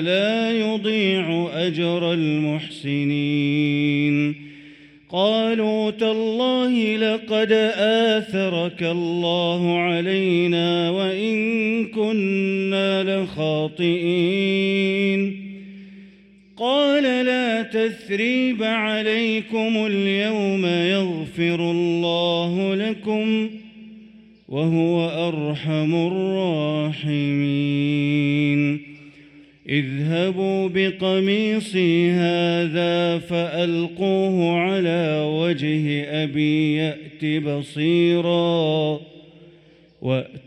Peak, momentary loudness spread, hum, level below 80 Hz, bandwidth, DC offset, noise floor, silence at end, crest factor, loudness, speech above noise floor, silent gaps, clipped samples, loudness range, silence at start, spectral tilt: -6 dBFS; 5 LU; none; -64 dBFS; 11 kHz; under 0.1%; -51 dBFS; 0.05 s; 14 dB; -21 LUFS; 31 dB; none; under 0.1%; 2 LU; 0 s; -7 dB/octave